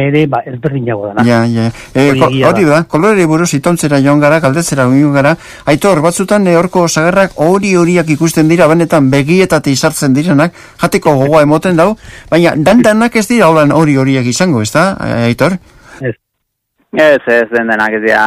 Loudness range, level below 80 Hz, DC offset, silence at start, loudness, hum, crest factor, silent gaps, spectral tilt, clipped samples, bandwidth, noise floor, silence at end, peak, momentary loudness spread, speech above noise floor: 3 LU; -42 dBFS; under 0.1%; 0 s; -9 LUFS; none; 10 dB; none; -5.5 dB/octave; 0.7%; 16 kHz; -70 dBFS; 0 s; 0 dBFS; 7 LU; 61 dB